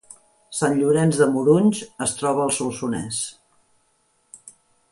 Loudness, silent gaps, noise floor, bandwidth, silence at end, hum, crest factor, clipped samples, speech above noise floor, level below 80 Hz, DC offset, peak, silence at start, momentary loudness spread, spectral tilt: -21 LUFS; none; -65 dBFS; 11.5 kHz; 0.4 s; none; 18 dB; under 0.1%; 45 dB; -60 dBFS; under 0.1%; -4 dBFS; 0.5 s; 10 LU; -5 dB/octave